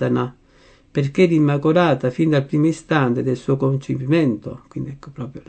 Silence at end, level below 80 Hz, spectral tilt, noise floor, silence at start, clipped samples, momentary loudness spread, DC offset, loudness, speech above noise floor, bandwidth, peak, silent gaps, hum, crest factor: 0.1 s; -54 dBFS; -8 dB/octave; -51 dBFS; 0 s; under 0.1%; 15 LU; under 0.1%; -19 LUFS; 33 dB; 8.8 kHz; -2 dBFS; none; none; 16 dB